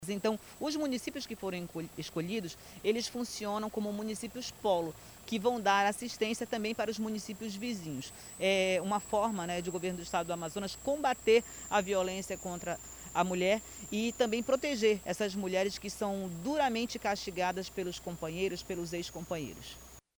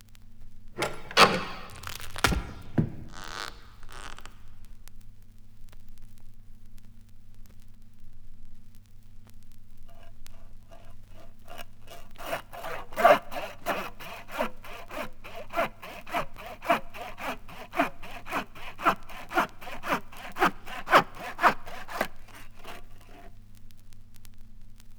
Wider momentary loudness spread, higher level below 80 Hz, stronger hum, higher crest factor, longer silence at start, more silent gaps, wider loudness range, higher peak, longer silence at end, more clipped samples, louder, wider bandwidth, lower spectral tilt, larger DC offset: second, 10 LU vs 24 LU; second, -60 dBFS vs -44 dBFS; neither; second, 20 dB vs 28 dB; about the same, 0 s vs 0 s; neither; second, 4 LU vs 17 LU; second, -14 dBFS vs -4 dBFS; first, 0.2 s vs 0 s; neither; second, -34 LUFS vs -29 LUFS; about the same, over 20 kHz vs over 20 kHz; about the same, -4 dB/octave vs -4 dB/octave; neither